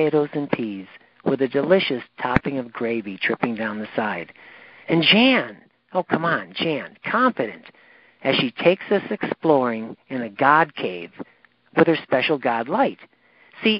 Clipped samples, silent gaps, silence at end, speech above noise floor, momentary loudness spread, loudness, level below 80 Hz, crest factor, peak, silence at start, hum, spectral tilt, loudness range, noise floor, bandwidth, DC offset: under 0.1%; none; 0 s; 27 dB; 13 LU; -21 LUFS; -56 dBFS; 22 dB; 0 dBFS; 0 s; none; -8.5 dB/octave; 3 LU; -48 dBFS; 5.6 kHz; under 0.1%